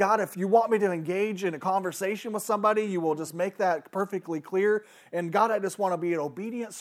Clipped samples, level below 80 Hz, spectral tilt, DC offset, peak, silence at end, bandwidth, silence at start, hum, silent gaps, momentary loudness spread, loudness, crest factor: under 0.1%; -90 dBFS; -5.5 dB/octave; under 0.1%; -10 dBFS; 0 s; 16 kHz; 0 s; none; none; 8 LU; -28 LUFS; 18 dB